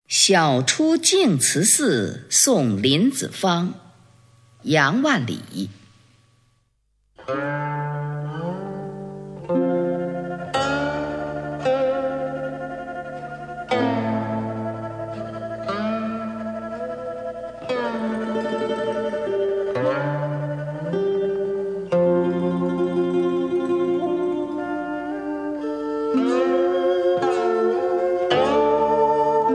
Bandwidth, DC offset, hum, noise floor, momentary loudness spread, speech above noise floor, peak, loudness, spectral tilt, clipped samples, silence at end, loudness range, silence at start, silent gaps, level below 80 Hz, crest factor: 11 kHz; under 0.1%; none; -67 dBFS; 14 LU; 47 dB; -2 dBFS; -22 LUFS; -4 dB/octave; under 0.1%; 0 s; 9 LU; 0.1 s; none; -56 dBFS; 20 dB